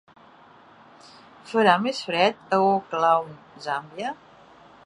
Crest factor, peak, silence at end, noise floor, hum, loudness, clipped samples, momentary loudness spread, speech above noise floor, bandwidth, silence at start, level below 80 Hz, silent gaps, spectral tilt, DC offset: 22 dB; -2 dBFS; 0.7 s; -51 dBFS; none; -23 LUFS; under 0.1%; 14 LU; 29 dB; 11 kHz; 1.45 s; -72 dBFS; none; -5 dB/octave; under 0.1%